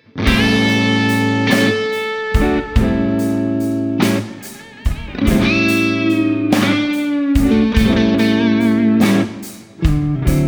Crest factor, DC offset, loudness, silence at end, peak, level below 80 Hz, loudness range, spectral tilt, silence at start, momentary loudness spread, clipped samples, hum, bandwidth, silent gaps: 14 dB; under 0.1%; -15 LUFS; 0 s; 0 dBFS; -26 dBFS; 3 LU; -6 dB/octave; 0.15 s; 8 LU; under 0.1%; none; over 20 kHz; none